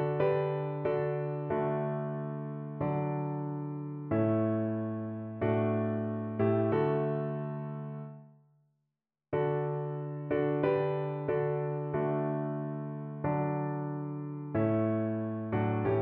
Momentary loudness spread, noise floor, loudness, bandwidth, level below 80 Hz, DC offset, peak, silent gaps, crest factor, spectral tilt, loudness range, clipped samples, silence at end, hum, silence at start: 9 LU; -86 dBFS; -33 LUFS; 4.3 kHz; -66 dBFS; under 0.1%; -16 dBFS; none; 16 dB; -8.5 dB/octave; 3 LU; under 0.1%; 0 s; none; 0 s